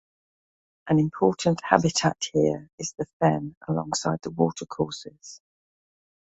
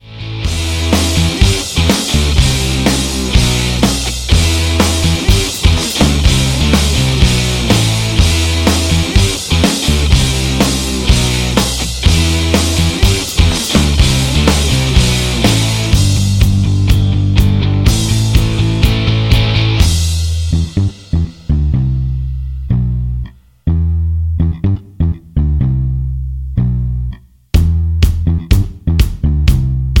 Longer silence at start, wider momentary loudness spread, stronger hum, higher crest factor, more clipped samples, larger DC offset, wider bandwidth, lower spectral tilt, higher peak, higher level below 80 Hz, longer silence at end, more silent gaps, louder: first, 0.85 s vs 0.05 s; first, 12 LU vs 6 LU; neither; first, 24 dB vs 12 dB; neither; neither; second, 8.2 kHz vs 17 kHz; about the same, -5 dB/octave vs -4.5 dB/octave; about the same, -2 dBFS vs 0 dBFS; second, -58 dBFS vs -16 dBFS; first, 1.05 s vs 0 s; first, 2.73-2.78 s, 3.13-3.20 s, 3.57-3.61 s vs none; second, -25 LUFS vs -13 LUFS